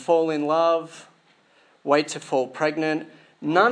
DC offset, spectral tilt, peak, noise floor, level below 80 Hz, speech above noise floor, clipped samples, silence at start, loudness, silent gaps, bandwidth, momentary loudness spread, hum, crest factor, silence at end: under 0.1%; -4.5 dB/octave; -4 dBFS; -59 dBFS; -86 dBFS; 37 dB; under 0.1%; 0 s; -23 LUFS; none; 10.5 kHz; 13 LU; none; 18 dB; 0 s